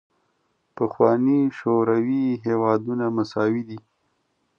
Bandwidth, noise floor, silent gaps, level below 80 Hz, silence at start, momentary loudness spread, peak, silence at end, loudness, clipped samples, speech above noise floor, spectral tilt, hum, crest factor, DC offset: 7 kHz; -70 dBFS; none; -68 dBFS; 0.75 s; 9 LU; -4 dBFS; 0.8 s; -22 LUFS; under 0.1%; 49 dB; -9 dB/octave; none; 18 dB; under 0.1%